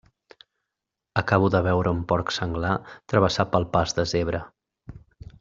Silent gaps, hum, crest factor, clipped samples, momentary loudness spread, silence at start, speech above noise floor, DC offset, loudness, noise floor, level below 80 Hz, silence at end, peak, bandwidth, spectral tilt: none; none; 22 dB; under 0.1%; 8 LU; 1.15 s; 62 dB; under 0.1%; -24 LUFS; -85 dBFS; -48 dBFS; 0.4 s; -4 dBFS; 7.6 kHz; -6 dB/octave